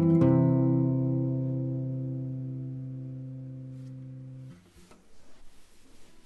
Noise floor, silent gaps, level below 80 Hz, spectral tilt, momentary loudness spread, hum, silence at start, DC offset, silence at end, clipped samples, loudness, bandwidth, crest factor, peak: -55 dBFS; none; -60 dBFS; -11 dB/octave; 21 LU; none; 0 s; under 0.1%; 0.05 s; under 0.1%; -28 LUFS; 3.3 kHz; 18 dB; -12 dBFS